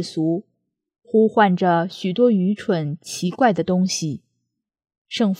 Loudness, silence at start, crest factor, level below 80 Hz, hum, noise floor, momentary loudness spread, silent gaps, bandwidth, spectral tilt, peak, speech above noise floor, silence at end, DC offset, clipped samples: -20 LUFS; 0 s; 18 dB; -68 dBFS; none; -77 dBFS; 11 LU; 4.98-5.05 s; 14 kHz; -5.5 dB/octave; -4 dBFS; 58 dB; 0.05 s; under 0.1%; under 0.1%